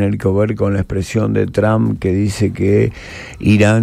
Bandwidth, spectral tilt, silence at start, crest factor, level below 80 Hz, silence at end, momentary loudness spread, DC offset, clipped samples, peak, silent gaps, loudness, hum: 13 kHz; -7.5 dB/octave; 0 s; 14 dB; -38 dBFS; 0 s; 6 LU; under 0.1%; under 0.1%; 0 dBFS; none; -16 LUFS; none